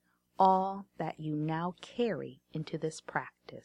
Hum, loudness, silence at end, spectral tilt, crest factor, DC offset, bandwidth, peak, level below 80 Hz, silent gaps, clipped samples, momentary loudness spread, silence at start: none; -34 LUFS; 0.05 s; -6.5 dB/octave; 22 dB; under 0.1%; 11 kHz; -12 dBFS; -72 dBFS; none; under 0.1%; 14 LU; 0.4 s